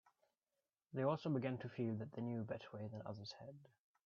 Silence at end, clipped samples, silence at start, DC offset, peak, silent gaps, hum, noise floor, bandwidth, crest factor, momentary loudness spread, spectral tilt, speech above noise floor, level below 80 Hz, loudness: 0.4 s; under 0.1%; 0.9 s; under 0.1%; -26 dBFS; none; none; under -90 dBFS; 7.2 kHz; 20 dB; 13 LU; -7 dB/octave; over 46 dB; -84 dBFS; -45 LUFS